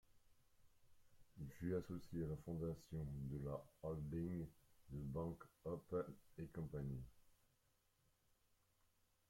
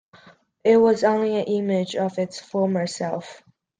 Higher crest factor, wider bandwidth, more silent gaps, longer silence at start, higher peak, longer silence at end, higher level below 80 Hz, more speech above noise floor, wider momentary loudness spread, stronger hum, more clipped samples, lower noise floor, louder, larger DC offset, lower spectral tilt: about the same, 18 dB vs 16 dB; first, 16.5 kHz vs 9.6 kHz; neither; second, 0.1 s vs 0.65 s; second, -32 dBFS vs -6 dBFS; first, 1.95 s vs 0.4 s; about the same, -66 dBFS vs -68 dBFS; about the same, 33 dB vs 31 dB; about the same, 10 LU vs 12 LU; neither; neither; first, -82 dBFS vs -52 dBFS; second, -50 LUFS vs -22 LUFS; neither; first, -9 dB/octave vs -6 dB/octave